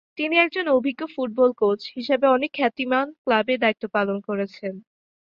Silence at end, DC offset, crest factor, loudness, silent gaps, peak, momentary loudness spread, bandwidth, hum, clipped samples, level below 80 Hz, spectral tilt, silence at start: 0.4 s; under 0.1%; 20 dB; -22 LUFS; 3.18-3.25 s; -4 dBFS; 9 LU; 6.8 kHz; none; under 0.1%; -68 dBFS; -7 dB/octave; 0.15 s